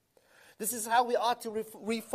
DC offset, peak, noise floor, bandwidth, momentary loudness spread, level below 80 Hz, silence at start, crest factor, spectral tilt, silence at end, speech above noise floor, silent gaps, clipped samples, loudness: under 0.1%; -14 dBFS; -62 dBFS; 15.5 kHz; 10 LU; -76 dBFS; 0.6 s; 18 dB; -2 dB/octave; 0 s; 31 dB; none; under 0.1%; -31 LUFS